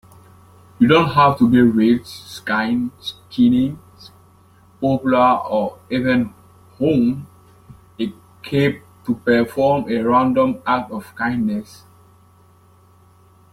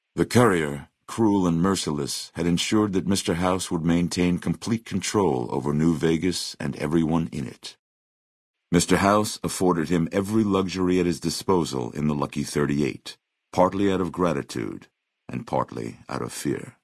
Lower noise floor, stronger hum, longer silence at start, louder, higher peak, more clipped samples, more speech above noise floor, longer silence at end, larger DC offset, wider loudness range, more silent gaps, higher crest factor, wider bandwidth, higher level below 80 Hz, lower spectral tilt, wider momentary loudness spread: second, -51 dBFS vs under -90 dBFS; neither; first, 0.8 s vs 0.15 s; first, -18 LUFS vs -24 LUFS; about the same, -2 dBFS vs -4 dBFS; neither; second, 34 dB vs over 66 dB; first, 1.9 s vs 0.15 s; neither; about the same, 5 LU vs 3 LU; second, none vs 7.79-8.54 s; about the same, 18 dB vs 20 dB; first, 14 kHz vs 12 kHz; about the same, -52 dBFS vs -52 dBFS; first, -7 dB/octave vs -5.5 dB/octave; first, 14 LU vs 11 LU